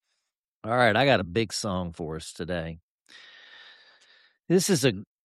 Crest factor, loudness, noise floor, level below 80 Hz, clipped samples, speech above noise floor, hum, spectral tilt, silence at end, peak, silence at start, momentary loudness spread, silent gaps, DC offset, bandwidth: 20 dB; -26 LUFS; -82 dBFS; -56 dBFS; under 0.1%; 57 dB; none; -4.5 dB/octave; 0.2 s; -8 dBFS; 0.65 s; 15 LU; 2.82-2.99 s; under 0.1%; 13.5 kHz